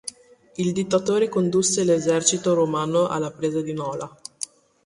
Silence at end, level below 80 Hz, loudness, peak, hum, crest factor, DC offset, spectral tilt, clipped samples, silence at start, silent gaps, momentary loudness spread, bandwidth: 0.4 s; -62 dBFS; -22 LUFS; -2 dBFS; none; 20 dB; under 0.1%; -4.5 dB/octave; under 0.1%; 0.05 s; none; 14 LU; 11.5 kHz